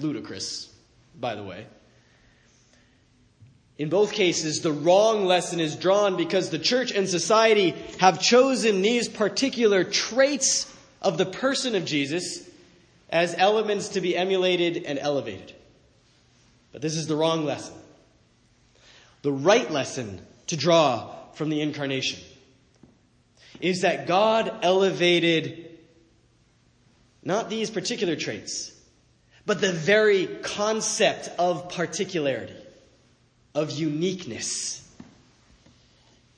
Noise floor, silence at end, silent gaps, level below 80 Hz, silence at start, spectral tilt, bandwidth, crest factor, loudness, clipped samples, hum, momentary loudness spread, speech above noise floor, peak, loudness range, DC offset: -62 dBFS; 1.35 s; none; -68 dBFS; 0 s; -3.5 dB/octave; 10.5 kHz; 22 dB; -24 LUFS; under 0.1%; none; 14 LU; 38 dB; -4 dBFS; 10 LU; under 0.1%